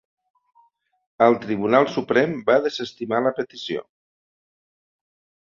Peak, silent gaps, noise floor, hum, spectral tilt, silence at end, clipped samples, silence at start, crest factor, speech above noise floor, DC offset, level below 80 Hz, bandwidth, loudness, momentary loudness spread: -2 dBFS; none; -61 dBFS; none; -6 dB/octave; 1.6 s; under 0.1%; 1.2 s; 22 dB; 40 dB; under 0.1%; -66 dBFS; 7.4 kHz; -21 LUFS; 11 LU